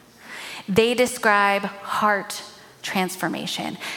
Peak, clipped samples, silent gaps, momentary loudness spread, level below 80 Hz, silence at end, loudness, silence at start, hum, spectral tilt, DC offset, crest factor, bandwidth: -4 dBFS; under 0.1%; none; 16 LU; -62 dBFS; 0 s; -22 LUFS; 0.2 s; none; -3.5 dB/octave; under 0.1%; 20 dB; 17.5 kHz